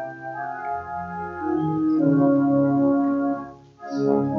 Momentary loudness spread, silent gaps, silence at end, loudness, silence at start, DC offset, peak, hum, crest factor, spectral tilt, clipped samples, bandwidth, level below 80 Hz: 13 LU; none; 0 s; -23 LUFS; 0 s; under 0.1%; -8 dBFS; none; 14 dB; -10 dB/octave; under 0.1%; 6.2 kHz; -58 dBFS